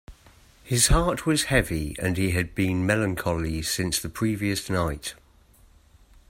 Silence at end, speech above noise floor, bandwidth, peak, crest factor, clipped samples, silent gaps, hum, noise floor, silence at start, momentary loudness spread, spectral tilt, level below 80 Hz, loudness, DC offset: 1.15 s; 31 dB; 16.5 kHz; -6 dBFS; 20 dB; under 0.1%; none; none; -56 dBFS; 0.1 s; 7 LU; -4 dB/octave; -36 dBFS; -25 LUFS; under 0.1%